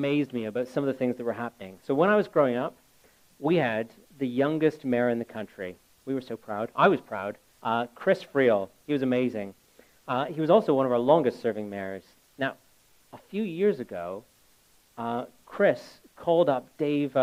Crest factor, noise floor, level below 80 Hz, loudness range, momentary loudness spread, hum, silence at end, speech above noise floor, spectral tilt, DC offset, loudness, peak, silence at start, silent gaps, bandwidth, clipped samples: 20 dB; -62 dBFS; -72 dBFS; 5 LU; 15 LU; none; 0 s; 35 dB; -7.5 dB/octave; under 0.1%; -27 LUFS; -6 dBFS; 0 s; none; 16 kHz; under 0.1%